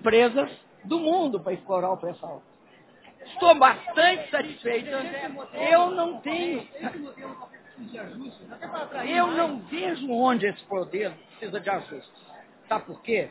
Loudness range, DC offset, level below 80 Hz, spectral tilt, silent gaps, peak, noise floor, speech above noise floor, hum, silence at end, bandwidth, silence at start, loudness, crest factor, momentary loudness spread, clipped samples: 8 LU; under 0.1%; -68 dBFS; -8 dB/octave; none; -4 dBFS; -55 dBFS; 30 dB; none; 0 s; 4 kHz; 0 s; -25 LUFS; 22 dB; 21 LU; under 0.1%